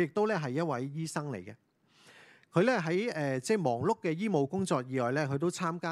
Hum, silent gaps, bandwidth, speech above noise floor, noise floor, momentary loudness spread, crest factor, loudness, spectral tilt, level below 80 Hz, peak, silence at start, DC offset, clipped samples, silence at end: none; none; 13 kHz; 30 dB; -61 dBFS; 8 LU; 18 dB; -31 LUFS; -6 dB/octave; -74 dBFS; -14 dBFS; 0 s; under 0.1%; under 0.1%; 0 s